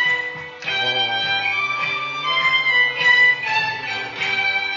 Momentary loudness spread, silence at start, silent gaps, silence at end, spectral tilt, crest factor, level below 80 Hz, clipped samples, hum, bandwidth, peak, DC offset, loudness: 10 LU; 0 s; none; 0 s; -1.5 dB/octave; 16 dB; -68 dBFS; under 0.1%; none; 7.4 kHz; -4 dBFS; under 0.1%; -17 LUFS